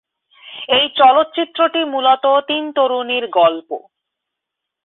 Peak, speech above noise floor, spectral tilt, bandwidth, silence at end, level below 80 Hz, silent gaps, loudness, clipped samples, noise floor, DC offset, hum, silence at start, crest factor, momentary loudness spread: -2 dBFS; 66 dB; -8 dB/octave; 4.2 kHz; 1.1 s; -66 dBFS; none; -15 LUFS; under 0.1%; -81 dBFS; under 0.1%; none; 0.45 s; 14 dB; 17 LU